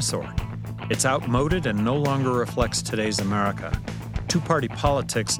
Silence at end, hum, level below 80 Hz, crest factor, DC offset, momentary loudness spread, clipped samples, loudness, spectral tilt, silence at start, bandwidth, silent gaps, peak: 0 s; none; -38 dBFS; 18 dB; under 0.1%; 9 LU; under 0.1%; -24 LUFS; -4.5 dB/octave; 0 s; 20 kHz; none; -6 dBFS